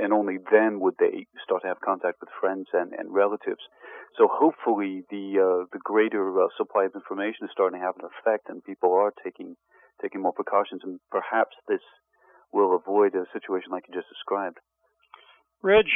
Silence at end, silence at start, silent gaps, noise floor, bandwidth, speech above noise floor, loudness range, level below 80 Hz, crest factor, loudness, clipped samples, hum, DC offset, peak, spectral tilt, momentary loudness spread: 0 s; 0 s; none; -57 dBFS; 3.8 kHz; 31 dB; 3 LU; -66 dBFS; 20 dB; -26 LUFS; under 0.1%; none; under 0.1%; -6 dBFS; -9 dB/octave; 13 LU